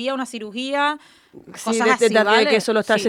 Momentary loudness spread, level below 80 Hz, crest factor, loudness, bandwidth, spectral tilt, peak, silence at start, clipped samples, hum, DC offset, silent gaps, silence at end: 13 LU; -68 dBFS; 18 dB; -18 LUFS; 15.5 kHz; -3 dB/octave; -2 dBFS; 0 s; under 0.1%; none; under 0.1%; none; 0 s